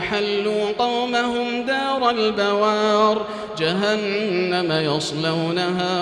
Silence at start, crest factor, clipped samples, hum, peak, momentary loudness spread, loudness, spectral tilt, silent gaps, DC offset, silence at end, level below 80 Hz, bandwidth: 0 s; 14 dB; under 0.1%; none; -6 dBFS; 4 LU; -21 LUFS; -5 dB/octave; none; under 0.1%; 0 s; -58 dBFS; 11 kHz